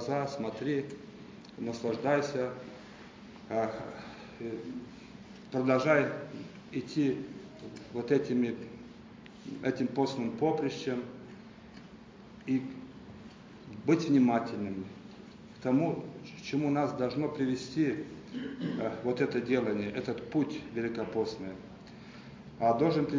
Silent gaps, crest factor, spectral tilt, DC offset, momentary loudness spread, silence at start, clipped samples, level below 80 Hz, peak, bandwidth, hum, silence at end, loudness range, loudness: none; 20 dB; -7 dB/octave; under 0.1%; 21 LU; 0 s; under 0.1%; -66 dBFS; -12 dBFS; 7.6 kHz; none; 0 s; 4 LU; -32 LUFS